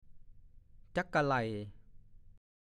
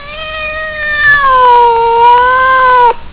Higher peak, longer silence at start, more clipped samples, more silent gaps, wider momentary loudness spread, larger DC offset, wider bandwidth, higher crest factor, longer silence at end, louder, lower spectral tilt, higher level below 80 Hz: second, -18 dBFS vs 0 dBFS; about the same, 0.05 s vs 0 s; neither; neither; about the same, 13 LU vs 11 LU; neither; first, 11 kHz vs 4 kHz; first, 20 dB vs 8 dB; first, 0.4 s vs 0.05 s; second, -35 LUFS vs -7 LUFS; about the same, -6.5 dB/octave vs -6.5 dB/octave; second, -58 dBFS vs -34 dBFS